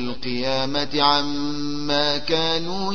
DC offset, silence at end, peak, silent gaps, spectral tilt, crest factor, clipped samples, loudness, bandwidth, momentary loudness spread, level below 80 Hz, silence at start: 4%; 0 s; -4 dBFS; none; -4.5 dB/octave; 20 dB; under 0.1%; -22 LUFS; 6.8 kHz; 8 LU; -48 dBFS; 0 s